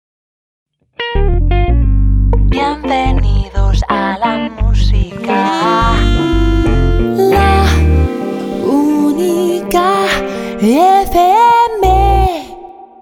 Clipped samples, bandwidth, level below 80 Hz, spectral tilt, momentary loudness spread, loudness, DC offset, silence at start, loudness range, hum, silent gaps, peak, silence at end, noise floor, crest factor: under 0.1%; 16.5 kHz; -16 dBFS; -6.5 dB/octave; 7 LU; -12 LUFS; under 0.1%; 1 s; 4 LU; none; none; 0 dBFS; 0.15 s; -32 dBFS; 10 dB